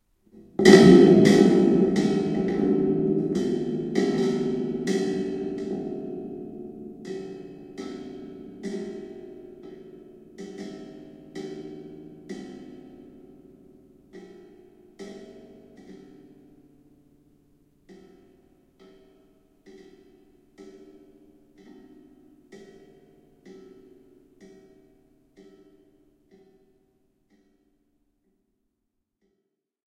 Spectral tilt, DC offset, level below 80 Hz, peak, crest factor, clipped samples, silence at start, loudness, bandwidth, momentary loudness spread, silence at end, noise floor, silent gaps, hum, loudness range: -6.5 dB/octave; under 0.1%; -58 dBFS; 0 dBFS; 26 dB; under 0.1%; 0.6 s; -21 LUFS; 13 kHz; 29 LU; 6.4 s; -79 dBFS; none; none; 29 LU